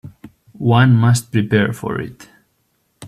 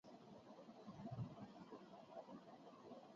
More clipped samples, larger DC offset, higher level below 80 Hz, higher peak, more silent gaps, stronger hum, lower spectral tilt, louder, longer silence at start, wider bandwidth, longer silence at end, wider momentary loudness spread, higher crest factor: neither; neither; first, -50 dBFS vs -80 dBFS; first, 0 dBFS vs -40 dBFS; neither; neither; about the same, -6.5 dB/octave vs -7 dB/octave; first, -16 LUFS vs -58 LUFS; about the same, 0.05 s vs 0.05 s; first, 13.5 kHz vs 7.2 kHz; about the same, 0 s vs 0 s; first, 13 LU vs 10 LU; about the same, 16 dB vs 18 dB